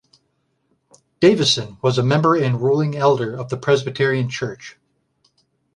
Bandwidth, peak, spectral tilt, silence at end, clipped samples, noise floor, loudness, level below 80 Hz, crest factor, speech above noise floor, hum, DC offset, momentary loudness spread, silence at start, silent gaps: 11 kHz; -2 dBFS; -5.5 dB/octave; 1.05 s; under 0.1%; -68 dBFS; -18 LUFS; -58 dBFS; 18 dB; 50 dB; none; under 0.1%; 10 LU; 1.2 s; none